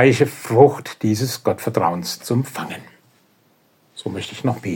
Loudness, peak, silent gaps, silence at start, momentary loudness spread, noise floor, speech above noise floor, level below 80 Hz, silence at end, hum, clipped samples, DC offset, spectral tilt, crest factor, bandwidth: -20 LUFS; 0 dBFS; none; 0 s; 17 LU; -59 dBFS; 40 dB; -62 dBFS; 0 s; none; under 0.1%; under 0.1%; -6 dB/octave; 20 dB; 17 kHz